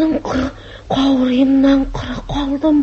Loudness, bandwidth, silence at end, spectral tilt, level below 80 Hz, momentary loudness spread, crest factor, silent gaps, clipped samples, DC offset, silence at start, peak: -16 LUFS; 7 kHz; 0 s; -6.5 dB/octave; -32 dBFS; 12 LU; 12 dB; none; under 0.1%; under 0.1%; 0 s; -2 dBFS